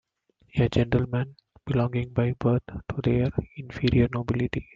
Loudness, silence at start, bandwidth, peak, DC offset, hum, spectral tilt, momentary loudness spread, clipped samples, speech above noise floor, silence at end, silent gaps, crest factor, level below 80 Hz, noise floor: -26 LUFS; 0.55 s; 7.2 kHz; -6 dBFS; under 0.1%; none; -8.5 dB/octave; 10 LU; under 0.1%; 40 dB; 0.15 s; none; 20 dB; -44 dBFS; -65 dBFS